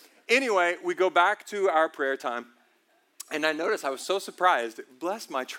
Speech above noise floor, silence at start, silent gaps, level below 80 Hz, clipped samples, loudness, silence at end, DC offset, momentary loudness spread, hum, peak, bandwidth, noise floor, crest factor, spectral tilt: 40 dB; 0.3 s; none; under -90 dBFS; under 0.1%; -26 LUFS; 0 s; under 0.1%; 12 LU; none; -8 dBFS; 17 kHz; -67 dBFS; 20 dB; -2 dB/octave